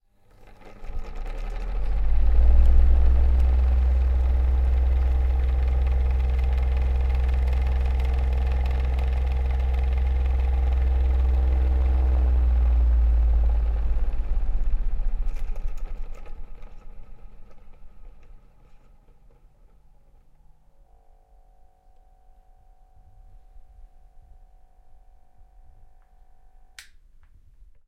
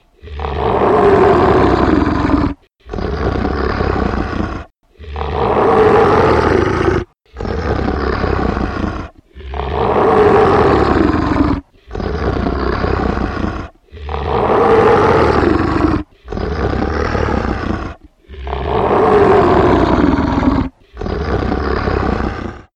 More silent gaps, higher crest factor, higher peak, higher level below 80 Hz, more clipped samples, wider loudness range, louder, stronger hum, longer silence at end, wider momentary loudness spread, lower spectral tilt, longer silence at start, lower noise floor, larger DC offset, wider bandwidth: neither; about the same, 16 dB vs 14 dB; second, -6 dBFS vs 0 dBFS; about the same, -22 dBFS vs -24 dBFS; neither; first, 12 LU vs 5 LU; second, -24 LUFS vs -14 LUFS; neither; first, 1.05 s vs 0.15 s; about the same, 15 LU vs 15 LU; about the same, -8 dB/octave vs -8 dB/octave; first, 0.4 s vs 0.25 s; first, -54 dBFS vs -35 dBFS; neither; second, 4.1 kHz vs 9.2 kHz